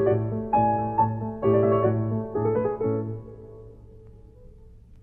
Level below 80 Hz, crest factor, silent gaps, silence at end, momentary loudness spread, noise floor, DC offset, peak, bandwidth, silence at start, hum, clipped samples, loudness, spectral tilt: -50 dBFS; 16 dB; none; 0.05 s; 16 LU; -48 dBFS; under 0.1%; -10 dBFS; 3.2 kHz; 0 s; none; under 0.1%; -24 LUFS; -12 dB/octave